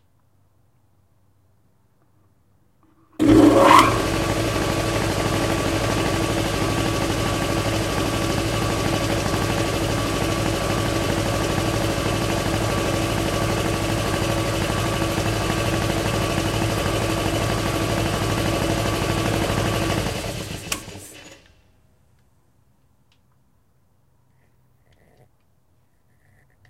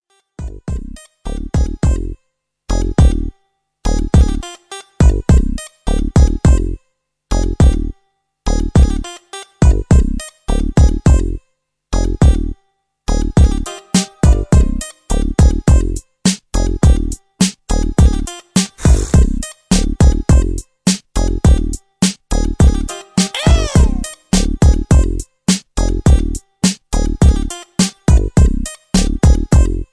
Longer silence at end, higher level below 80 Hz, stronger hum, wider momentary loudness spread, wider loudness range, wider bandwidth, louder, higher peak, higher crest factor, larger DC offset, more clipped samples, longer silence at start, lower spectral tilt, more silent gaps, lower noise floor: first, 5.35 s vs 0.1 s; second, -36 dBFS vs -16 dBFS; neither; second, 1 LU vs 13 LU; first, 7 LU vs 2 LU; first, 16 kHz vs 11 kHz; second, -21 LUFS vs -15 LUFS; about the same, 0 dBFS vs 0 dBFS; first, 22 dB vs 12 dB; neither; neither; first, 3.2 s vs 0.4 s; about the same, -5 dB/octave vs -5.5 dB/octave; neither; second, -63 dBFS vs -67 dBFS